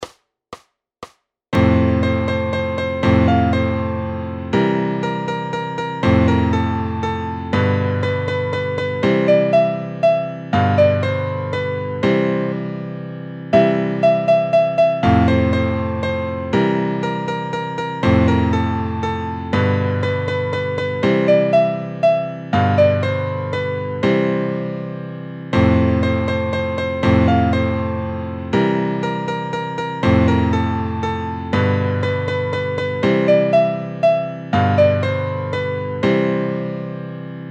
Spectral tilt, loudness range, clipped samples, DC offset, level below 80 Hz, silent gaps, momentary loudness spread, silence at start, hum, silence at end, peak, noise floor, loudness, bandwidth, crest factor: -8 dB/octave; 2 LU; under 0.1%; under 0.1%; -38 dBFS; none; 9 LU; 0 s; none; 0 s; -2 dBFS; -41 dBFS; -18 LUFS; 8.6 kHz; 16 dB